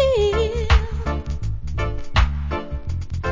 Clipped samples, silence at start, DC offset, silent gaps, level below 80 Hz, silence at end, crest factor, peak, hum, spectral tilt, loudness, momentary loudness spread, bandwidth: under 0.1%; 0 s; under 0.1%; none; -24 dBFS; 0 s; 18 dB; -4 dBFS; none; -6 dB/octave; -23 LUFS; 9 LU; 7.6 kHz